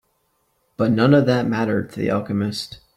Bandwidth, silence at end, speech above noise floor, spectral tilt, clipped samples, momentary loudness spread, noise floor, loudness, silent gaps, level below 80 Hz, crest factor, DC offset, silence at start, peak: 14.5 kHz; 0.2 s; 48 dB; -7 dB/octave; under 0.1%; 9 LU; -67 dBFS; -20 LUFS; none; -56 dBFS; 16 dB; under 0.1%; 0.8 s; -4 dBFS